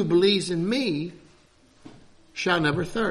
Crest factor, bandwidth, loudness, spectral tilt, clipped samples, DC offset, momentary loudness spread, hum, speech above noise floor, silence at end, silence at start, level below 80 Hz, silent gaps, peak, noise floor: 16 dB; 12.5 kHz; -24 LUFS; -5 dB/octave; under 0.1%; under 0.1%; 12 LU; none; 34 dB; 0 s; 0 s; -54 dBFS; none; -8 dBFS; -57 dBFS